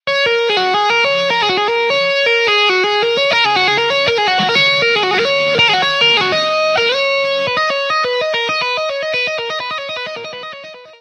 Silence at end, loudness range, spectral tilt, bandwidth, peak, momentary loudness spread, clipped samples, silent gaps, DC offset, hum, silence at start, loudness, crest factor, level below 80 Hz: 0.05 s; 5 LU; -2.5 dB/octave; 12 kHz; -2 dBFS; 9 LU; under 0.1%; none; under 0.1%; none; 0.05 s; -13 LUFS; 14 dB; -60 dBFS